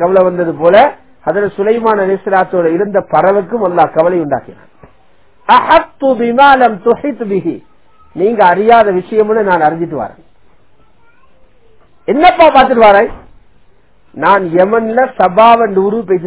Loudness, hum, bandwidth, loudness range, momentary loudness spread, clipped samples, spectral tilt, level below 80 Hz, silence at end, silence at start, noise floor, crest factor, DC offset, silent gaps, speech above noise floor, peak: -10 LUFS; none; 4 kHz; 3 LU; 11 LU; 2%; -9.5 dB/octave; -44 dBFS; 0 s; 0 s; -50 dBFS; 10 dB; 0.5%; none; 41 dB; 0 dBFS